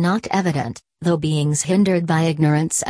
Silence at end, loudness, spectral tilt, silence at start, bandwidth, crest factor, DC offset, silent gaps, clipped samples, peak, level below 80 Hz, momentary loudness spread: 0 s; -19 LUFS; -5.5 dB/octave; 0 s; 11 kHz; 16 dB; under 0.1%; none; under 0.1%; -2 dBFS; -54 dBFS; 7 LU